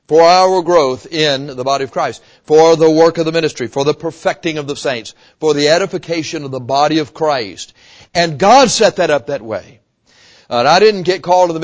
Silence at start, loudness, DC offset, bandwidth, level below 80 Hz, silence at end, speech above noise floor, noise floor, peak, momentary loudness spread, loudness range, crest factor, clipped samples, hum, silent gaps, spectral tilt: 0.1 s; -13 LUFS; under 0.1%; 8 kHz; -52 dBFS; 0 s; 37 dB; -50 dBFS; 0 dBFS; 13 LU; 4 LU; 14 dB; under 0.1%; none; none; -4 dB/octave